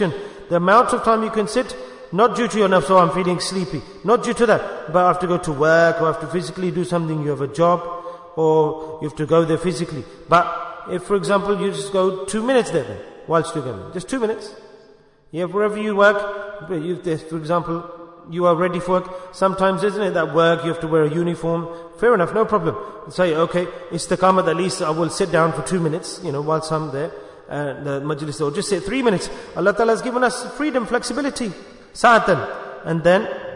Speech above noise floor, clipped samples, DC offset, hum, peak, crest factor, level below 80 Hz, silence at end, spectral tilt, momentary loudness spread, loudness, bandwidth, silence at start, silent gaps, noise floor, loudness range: 31 dB; under 0.1%; under 0.1%; none; -2 dBFS; 18 dB; -50 dBFS; 0 s; -5.5 dB/octave; 13 LU; -20 LUFS; 11 kHz; 0 s; none; -50 dBFS; 4 LU